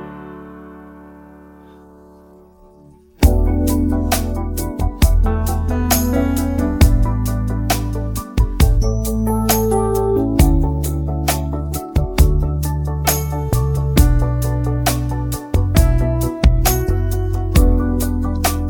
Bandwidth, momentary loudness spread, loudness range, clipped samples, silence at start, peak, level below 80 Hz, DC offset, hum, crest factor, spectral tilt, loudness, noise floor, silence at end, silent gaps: 18 kHz; 8 LU; 3 LU; under 0.1%; 0 s; 0 dBFS; -20 dBFS; under 0.1%; none; 16 dB; -6 dB/octave; -18 LUFS; -46 dBFS; 0 s; none